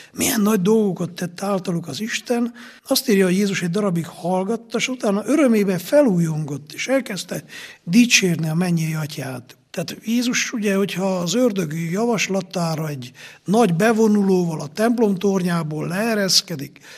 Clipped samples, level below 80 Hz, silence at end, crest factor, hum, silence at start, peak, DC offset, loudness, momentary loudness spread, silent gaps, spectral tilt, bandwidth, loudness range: under 0.1%; -66 dBFS; 0 s; 20 dB; none; 0 s; 0 dBFS; under 0.1%; -20 LUFS; 13 LU; none; -4.5 dB/octave; 15 kHz; 3 LU